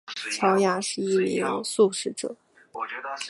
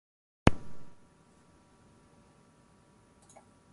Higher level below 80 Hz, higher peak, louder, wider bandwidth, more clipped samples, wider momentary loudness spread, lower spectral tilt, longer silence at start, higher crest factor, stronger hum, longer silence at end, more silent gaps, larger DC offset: second, -74 dBFS vs -46 dBFS; second, -8 dBFS vs 0 dBFS; first, -25 LUFS vs -29 LUFS; about the same, 11.5 kHz vs 11.5 kHz; neither; second, 13 LU vs 29 LU; second, -4 dB/octave vs -6.5 dB/octave; second, 0.05 s vs 0.45 s; second, 18 dB vs 36 dB; neither; second, 0 s vs 2.75 s; neither; neither